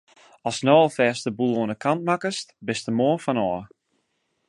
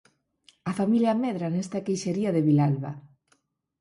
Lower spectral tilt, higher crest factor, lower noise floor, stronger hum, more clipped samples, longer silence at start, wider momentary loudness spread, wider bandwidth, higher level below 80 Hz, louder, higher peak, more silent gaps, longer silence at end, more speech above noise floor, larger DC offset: second, -5.5 dB/octave vs -7.5 dB/octave; first, 20 dB vs 14 dB; about the same, -73 dBFS vs -70 dBFS; neither; neither; second, 0.45 s vs 0.65 s; about the same, 12 LU vs 13 LU; about the same, 11.5 kHz vs 11.5 kHz; about the same, -64 dBFS vs -68 dBFS; first, -23 LUFS vs -26 LUFS; first, -4 dBFS vs -12 dBFS; neither; about the same, 0.85 s vs 0.75 s; first, 50 dB vs 45 dB; neither